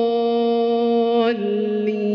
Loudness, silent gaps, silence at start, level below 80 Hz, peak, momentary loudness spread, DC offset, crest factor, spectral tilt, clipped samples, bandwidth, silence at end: -19 LUFS; none; 0 s; -68 dBFS; -8 dBFS; 4 LU; under 0.1%; 12 dB; -4.5 dB/octave; under 0.1%; 5.8 kHz; 0 s